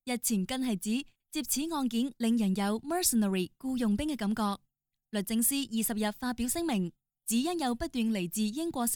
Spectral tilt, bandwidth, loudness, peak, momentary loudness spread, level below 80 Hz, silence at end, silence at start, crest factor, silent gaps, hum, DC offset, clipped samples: -4 dB/octave; over 20 kHz; -31 LUFS; -14 dBFS; 7 LU; -56 dBFS; 0 s; 0.05 s; 18 dB; none; none; under 0.1%; under 0.1%